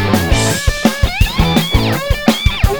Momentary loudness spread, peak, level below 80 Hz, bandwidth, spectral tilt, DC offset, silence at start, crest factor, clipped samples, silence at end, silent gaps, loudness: 2 LU; 0 dBFS; -18 dBFS; over 20 kHz; -4.5 dB/octave; under 0.1%; 0 s; 12 dB; 0.2%; 0 s; none; -14 LUFS